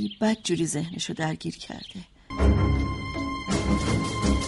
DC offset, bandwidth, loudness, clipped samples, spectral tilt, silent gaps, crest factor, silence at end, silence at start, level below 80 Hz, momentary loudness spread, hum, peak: under 0.1%; 11.5 kHz; -27 LUFS; under 0.1%; -5.5 dB/octave; none; 18 dB; 0 s; 0 s; -32 dBFS; 14 LU; none; -8 dBFS